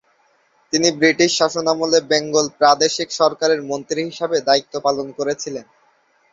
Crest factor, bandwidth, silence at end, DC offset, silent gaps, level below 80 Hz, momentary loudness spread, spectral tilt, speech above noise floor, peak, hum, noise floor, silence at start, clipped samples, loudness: 18 dB; 7.8 kHz; 0.7 s; under 0.1%; none; -62 dBFS; 9 LU; -2.5 dB/octave; 42 dB; 0 dBFS; none; -60 dBFS; 0.75 s; under 0.1%; -18 LUFS